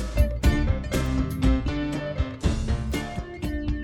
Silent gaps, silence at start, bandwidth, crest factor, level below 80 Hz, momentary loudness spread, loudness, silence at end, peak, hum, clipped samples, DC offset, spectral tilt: none; 0 s; 13 kHz; 16 dB; -28 dBFS; 7 LU; -27 LUFS; 0 s; -8 dBFS; none; under 0.1%; under 0.1%; -6.5 dB/octave